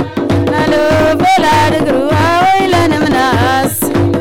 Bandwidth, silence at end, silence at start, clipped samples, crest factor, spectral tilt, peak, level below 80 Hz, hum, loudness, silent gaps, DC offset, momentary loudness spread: 17 kHz; 0 s; 0 s; under 0.1%; 6 dB; -5.5 dB/octave; -6 dBFS; -36 dBFS; none; -11 LUFS; none; under 0.1%; 4 LU